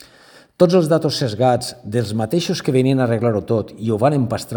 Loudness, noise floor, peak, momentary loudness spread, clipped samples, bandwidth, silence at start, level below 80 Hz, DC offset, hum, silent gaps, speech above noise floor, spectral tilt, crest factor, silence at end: -18 LUFS; -48 dBFS; 0 dBFS; 7 LU; under 0.1%; over 20 kHz; 0.6 s; -56 dBFS; under 0.1%; none; none; 30 dB; -6.5 dB/octave; 18 dB; 0 s